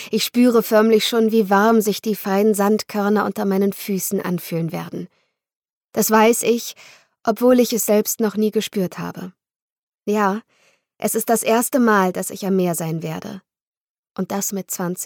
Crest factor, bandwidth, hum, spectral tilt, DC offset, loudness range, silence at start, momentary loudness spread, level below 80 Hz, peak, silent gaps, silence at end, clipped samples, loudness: 14 dB; 19 kHz; none; -4.5 dB/octave; under 0.1%; 6 LU; 0 s; 15 LU; -66 dBFS; -4 dBFS; 5.56-5.60 s, 5.70-5.81 s, 9.56-9.87 s, 13.62-14.03 s; 0 s; under 0.1%; -19 LUFS